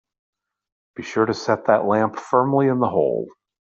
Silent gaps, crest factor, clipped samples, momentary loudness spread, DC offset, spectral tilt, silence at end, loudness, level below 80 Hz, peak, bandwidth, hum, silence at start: none; 18 dB; under 0.1%; 13 LU; under 0.1%; -7 dB/octave; 0.35 s; -20 LUFS; -64 dBFS; -4 dBFS; 8 kHz; none; 1 s